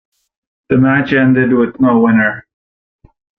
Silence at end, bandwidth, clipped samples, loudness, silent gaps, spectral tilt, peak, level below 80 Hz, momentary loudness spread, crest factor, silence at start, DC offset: 1 s; 4.6 kHz; under 0.1%; -12 LUFS; none; -9.5 dB/octave; -2 dBFS; -48 dBFS; 6 LU; 12 dB; 0.7 s; under 0.1%